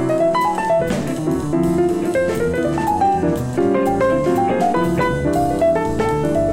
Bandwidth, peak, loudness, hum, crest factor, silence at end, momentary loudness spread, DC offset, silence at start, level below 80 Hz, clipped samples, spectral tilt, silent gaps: 16.5 kHz; -6 dBFS; -18 LUFS; none; 10 dB; 0 s; 3 LU; under 0.1%; 0 s; -38 dBFS; under 0.1%; -7 dB/octave; none